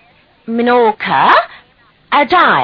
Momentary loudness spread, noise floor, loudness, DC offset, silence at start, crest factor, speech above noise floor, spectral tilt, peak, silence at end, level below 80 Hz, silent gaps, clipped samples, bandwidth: 9 LU; -50 dBFS; -11 LUFS; under 0.1%; 0.5 s; 12 dB; 39 dB; -6.5 dB/octave; 0 dBFS; 0 s; -52 dBFS; none; 0.1%; 5.4 kHz